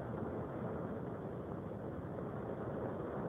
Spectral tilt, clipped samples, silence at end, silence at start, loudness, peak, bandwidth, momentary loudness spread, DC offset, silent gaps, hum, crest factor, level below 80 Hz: -10 dB/octave; under 0.1%; 0 s; 0 s; -43 LUFS; -28 dBFS; 13 kHz; 3 LU; under 0.1%; none; none; 14 dB; -60 dBFS